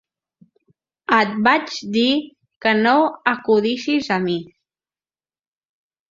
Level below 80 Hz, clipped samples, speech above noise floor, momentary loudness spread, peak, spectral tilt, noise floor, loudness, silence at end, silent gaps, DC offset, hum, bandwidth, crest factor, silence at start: -64 dBFS; under 0.1%; over 72 dB; 8 LU; -2 dBFS; -5 dB/octave; under -90 dBFS; -18 LUFS; 1.65 s; 2.56-2.61 s; under 0.1%; none; 7.6 kHz; 20 dB; 1.1 s